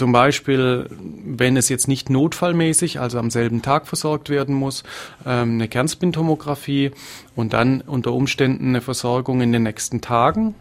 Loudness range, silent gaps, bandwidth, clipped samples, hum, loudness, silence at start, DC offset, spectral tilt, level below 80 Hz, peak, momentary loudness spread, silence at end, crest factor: 3 LU; none; 16 kHz; under 0.1%; none; -19 LUFS; 0 s; under 0.1%; -5 dB/octave; -50 dBFS; 0 dBFS; 8 LU; 0.05 s; 18 dB